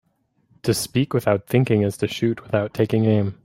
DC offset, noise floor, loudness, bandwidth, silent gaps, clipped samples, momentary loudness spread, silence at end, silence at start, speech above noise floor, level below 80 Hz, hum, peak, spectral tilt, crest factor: under 0.1%; -64 dBFS; -21 LUFS; 16.5 kHz; none; under 0.1%; 5 LU; 0.1 s; 0.65 s; 43 dB; -56 dBFS; none; -4 dBFS; -6.5 dB/octave; 18 dB